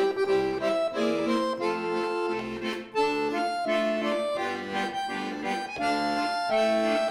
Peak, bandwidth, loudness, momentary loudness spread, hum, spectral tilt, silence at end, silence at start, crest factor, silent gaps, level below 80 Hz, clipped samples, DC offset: -14 dBFS; 14.5 kHz; -28 LUFS; 6 LU; none; -4.5 dB/octave; 0 s; 0 s; 14 dB; none; -62 dBFS; under 0.1%; under 0.1%